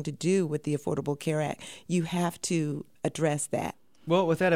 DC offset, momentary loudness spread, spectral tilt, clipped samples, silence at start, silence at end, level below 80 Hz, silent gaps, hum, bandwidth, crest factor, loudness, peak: 0.1%; 7 LU; -5.5 dB/octave; under 0.1%; 0 s; 0 s; -64 dBFS; none; none; 16 kHz; 18 dB; -29 LUFS; -12 dBFS